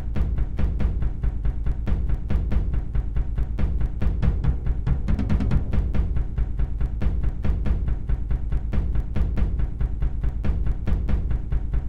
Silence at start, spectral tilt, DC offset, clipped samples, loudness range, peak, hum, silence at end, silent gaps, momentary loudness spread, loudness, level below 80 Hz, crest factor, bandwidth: 0 s; -9.5 dB/octave; 2%; under 0.1%; 2 LU; -8 dBFS; none; 0 s; none; 4 LU; -27 LUFS; -24 dBFS; 14 dB; 4.4 kHz